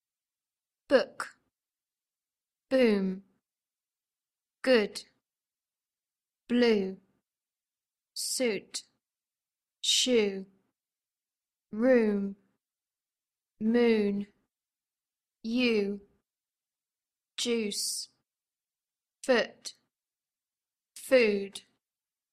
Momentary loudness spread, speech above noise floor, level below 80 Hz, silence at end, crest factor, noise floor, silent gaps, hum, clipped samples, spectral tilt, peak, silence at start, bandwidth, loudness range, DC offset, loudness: 18 LU; over 63 dB; -72 dBFS; 0.75 s; 22 dB; under -90 dBFS; none; none; under 0.1%; -3.5 dB/octave; -12 dBFS; 0.9 s; 14.5 kHz; 5 LU; under 0.1%; -28 LUFS